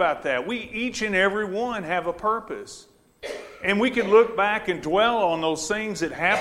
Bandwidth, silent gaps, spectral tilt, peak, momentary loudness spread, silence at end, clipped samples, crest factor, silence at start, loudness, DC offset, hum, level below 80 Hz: 13 kHz; none; -4 dB/octave; -6 dBFS; 17 LU; 0 s; under 0.1%; 18 dB; 0 s; -23 LUFS; under 0.1%; none; -54 dBFS